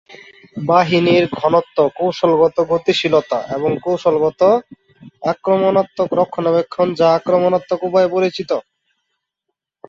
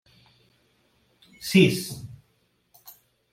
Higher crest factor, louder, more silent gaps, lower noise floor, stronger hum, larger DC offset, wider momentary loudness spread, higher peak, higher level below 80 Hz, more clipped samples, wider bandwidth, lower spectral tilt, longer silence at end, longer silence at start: second, 16 dB vs 24 dB; first, -16 LUFS vs -22 LUFS; neither; first, -78 dBFS vs -68 dBFS; neither; neither; second, 7 LU vs 22 LU; first, -2 dBFS vs -6 dBFS; first, -56 dBFS vs -64 dBFS; neither; second, 7.6 kHz vs 16 kHz; about the same, -6.5 dB/octave vs -5.5 dB/octave; first, 1.3 s vs 1.15 s; second, 0.1 s vs 1.4 s